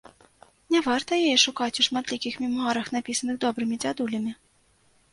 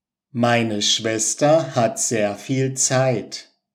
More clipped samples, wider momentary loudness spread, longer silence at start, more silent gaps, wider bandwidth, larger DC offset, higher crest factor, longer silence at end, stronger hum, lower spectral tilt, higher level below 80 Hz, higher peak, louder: neither; about the same, 9 LU vs 8 LU; first, 0.7 s vs 0.35 s; neither; second, 11.5 kHz vs 16 kHz; neither; about the same, 20 dB vs 16 dB; first, 0.8 s vs 0.3 s; neither; second, -2 dB/octave vs -3.5 dB/octave; first, -66 dBFS vs -72 dBFS; about the same, -6 dBFS vs -4 dBFS; second, -25 LUFS vs -19 LUFS